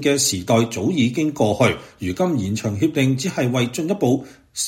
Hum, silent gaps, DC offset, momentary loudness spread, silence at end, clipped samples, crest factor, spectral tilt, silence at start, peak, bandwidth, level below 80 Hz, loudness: none; none; under 0.1%; 6 LU; 0 s; under 0.1%; 18 dB; -5 dB/octave; 0 s; -2 dBFS; 16.5 kHz; -52 dBFS; -20 LUFS